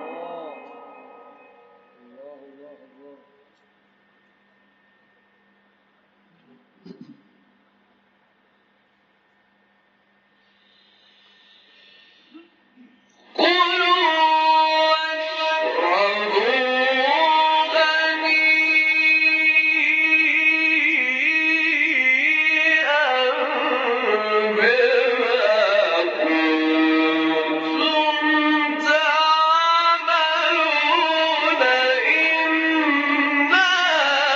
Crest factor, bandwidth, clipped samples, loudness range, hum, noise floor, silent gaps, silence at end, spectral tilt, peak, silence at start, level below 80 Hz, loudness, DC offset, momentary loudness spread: 16 dB; 7.8 kHz; under 0.1%; 4 LU; none; -62 dBFS; none; 0 s; 2 dB/octave; -4 dBFS; 0 s; -78 dBFS; -17 LUFS; under 0.1%; 6 LU